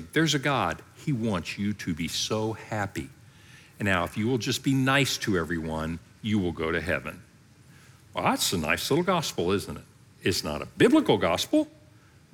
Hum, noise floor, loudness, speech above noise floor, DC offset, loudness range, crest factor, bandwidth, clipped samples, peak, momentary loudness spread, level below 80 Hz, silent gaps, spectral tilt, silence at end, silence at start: none; -55 dBFS; -27 LUFS; 29 dB; under 0.1%; 5 LU; 20 dB; 19 kHz; under 0.1%; -8 dBFS; 11 LU; -56 dBFS; none; -4.5 dB/octave; 0.65 s; 0 s